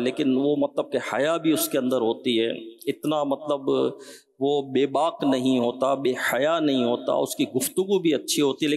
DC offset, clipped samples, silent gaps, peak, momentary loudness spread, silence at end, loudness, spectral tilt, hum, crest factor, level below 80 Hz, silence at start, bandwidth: under 0.1%; under 0.1%; none; -12 dBFS; 4 LU; 0 s; -24 LUFS; -4 dB/octave; none; 12 dB; -76 dBFS; 0 s; 16 kHz